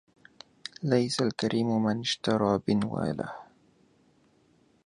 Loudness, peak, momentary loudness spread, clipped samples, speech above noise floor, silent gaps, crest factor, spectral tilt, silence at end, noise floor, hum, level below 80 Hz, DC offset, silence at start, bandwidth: -28 LUFS; -10 dBFS; 13 LU; under 0.1%; 37 dB; none; 20 dB; -5.5 dB/octave; 1.4 s; -65 dBFS; none; -62 dBFS; under 0.1%; 0.8 s; 11 kHz